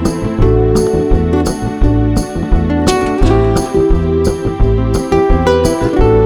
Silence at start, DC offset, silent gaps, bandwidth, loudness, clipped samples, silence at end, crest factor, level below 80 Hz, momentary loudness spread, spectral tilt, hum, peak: 0 s; 0.3%; none; 18 kHz; -13 LUFS; under 0.1%; 0 s; 12 dB; -16 dBFS; 4 LU; -7 dB/octave; none; 0 dBFS